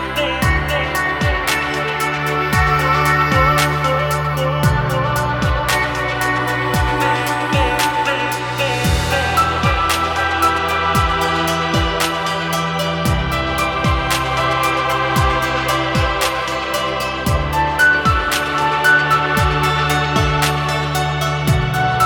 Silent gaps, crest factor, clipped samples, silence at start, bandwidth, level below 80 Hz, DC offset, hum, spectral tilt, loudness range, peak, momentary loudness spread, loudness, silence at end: none; 14 dB; under 0.1%; 0 s; 19 kHz; -28 dBFS; under 0.1%; none; -4.5 dB/octave; 2 LU; -2 dBFS; 5 LU; -16 LUFS; 0 s